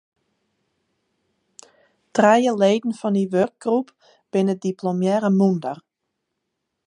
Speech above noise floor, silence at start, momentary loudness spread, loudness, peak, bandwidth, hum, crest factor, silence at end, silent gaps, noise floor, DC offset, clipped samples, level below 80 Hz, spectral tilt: 59 dB; 2.15 s; 10 LU; -20 LUFS; -2 dBFS; 10.5 kHz; none; 20 dB; 1.1 s; none; -79 dBFS; under 0.1%; under 0.1%; -72 dBFS; -6.5 dB/octave